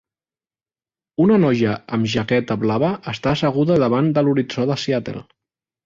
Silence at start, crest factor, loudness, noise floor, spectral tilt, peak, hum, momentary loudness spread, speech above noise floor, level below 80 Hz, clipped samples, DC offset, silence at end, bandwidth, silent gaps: 1.2 s; 14 dB; -19 LUFS; under -90 dBFS; -7 dB/octave; -4 dBFS; none; 8 LU; over 72 dB; -52 dBFS; under 0.1%; under 0.1%; 0.65 s; 7.6 kHz; none